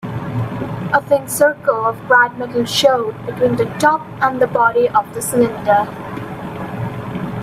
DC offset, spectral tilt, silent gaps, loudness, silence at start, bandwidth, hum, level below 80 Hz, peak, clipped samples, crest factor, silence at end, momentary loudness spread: under 0.1%; -4.5 dB/octave; none; -16 LUFS; 0 s; 16 kHz; none; -50 dBFS; 0 dBFS; under 0.1%; 16 dB; 0 s; 12 LU